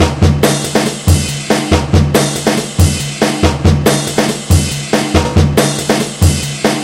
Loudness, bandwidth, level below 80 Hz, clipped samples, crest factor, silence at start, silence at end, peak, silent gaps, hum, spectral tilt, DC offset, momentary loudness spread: -12 LUFS; 16.5 kHz; -24 dBFS; 0.4%; 12 dB; 0 s; 0 s; 0 dBFS; none; none; -5 dB/octave; under 0.1%; 4 LU